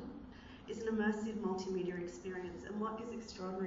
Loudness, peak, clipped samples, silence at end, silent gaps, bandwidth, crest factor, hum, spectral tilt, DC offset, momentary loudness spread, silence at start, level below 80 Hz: -41 LUFS; -24 dBFS; under 0.1%; 0 s; none; 7.6 kHz; 18 dB; none; -5.5 dB/octave; under 0.1%; 14 LU; 0 s; -64 dBFS